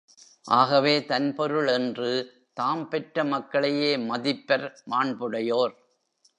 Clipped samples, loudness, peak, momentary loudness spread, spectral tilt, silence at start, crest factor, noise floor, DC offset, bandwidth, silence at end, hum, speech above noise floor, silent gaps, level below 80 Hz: under 0.1%; -25 LUFS; -6 dBFS; 8 LU; -5.5 dB/octave; 0.45 s; 20 dB; -67 dBFS; under 0.1%; 10 kHz; 0.65 s; none; 42 dB; none; -80 dBFS